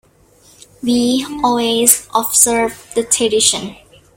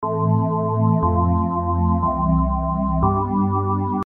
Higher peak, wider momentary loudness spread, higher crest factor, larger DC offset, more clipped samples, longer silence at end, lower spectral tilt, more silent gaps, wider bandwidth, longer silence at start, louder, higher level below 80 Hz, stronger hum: first, 0 dBFS vs -6 dBFS; first, 11 LU vs 3 LU; about the same, 16 dB vs 14 dB; neither; neither; first, 0.4 s vs 0 s; second, -1.5 dB/octave vs -13 dB/octave; neither; first, over 20 kHz vs 2.5 kHz; first, 0.85 s vs 0 s; first, -14 LUFS vs -20 LUFS; second, -50 dBFS vs -30 dBFS; neither